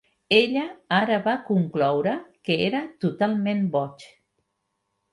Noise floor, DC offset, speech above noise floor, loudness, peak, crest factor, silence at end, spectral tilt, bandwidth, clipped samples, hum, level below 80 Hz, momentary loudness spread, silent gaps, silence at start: -77 dBFS; under 0.1%; 54 dB; -24 LUFS; -6 dBFS; 20 dB; 1.05 s; -7 dB/octave; 11.5 kHz; under 0.1%; none; -68 dBFS; 8 LU; none; 0.3 s